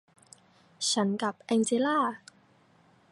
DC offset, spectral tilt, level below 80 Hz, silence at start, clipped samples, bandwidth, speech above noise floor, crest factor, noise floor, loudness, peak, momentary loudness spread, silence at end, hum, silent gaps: under 0.1%; -3.5 dB/octave; -78 dBFS; 0.8 s; under 0.1%; 11.5 kHz; 35 dB; 16 dB; -62 dBFS; -28 LUFS; -16 dBFS; 7 LU; 0.95 s; none; none